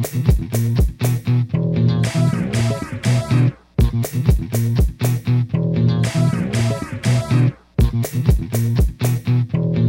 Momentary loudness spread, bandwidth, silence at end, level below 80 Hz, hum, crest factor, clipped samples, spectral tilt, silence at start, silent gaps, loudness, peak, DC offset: 3 LU; 17 kHz; 0 s; -26 dBFS; none; 14 dB; under 0.1%; -7 dB/octave; 0 s; none; -19 LUFS; -2 dBFS; under 0.1%